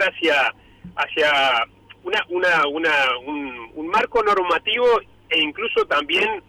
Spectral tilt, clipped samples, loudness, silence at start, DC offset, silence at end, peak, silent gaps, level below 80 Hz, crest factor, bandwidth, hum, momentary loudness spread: -3 dB/octave; under 0.1%; -19 LUFS; 0 s; under 0.1%; 0.1 s; -10 dBFS; none; -56 dBFS; 10 dB; 15 kHz; none; 12 LU